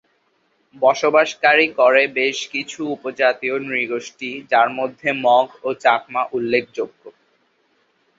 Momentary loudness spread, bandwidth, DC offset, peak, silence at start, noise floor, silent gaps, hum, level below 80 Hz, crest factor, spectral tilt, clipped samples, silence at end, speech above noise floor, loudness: 12 LU; 7.8 kHz; under 0.1%; -2 dBFS; 0.8 s; -64 dBFS; none; none; -68 dBFS; 18 dB; -3.5 dB/octave; under 0.1%; 1.1 s; 46 dB; -18 LUFS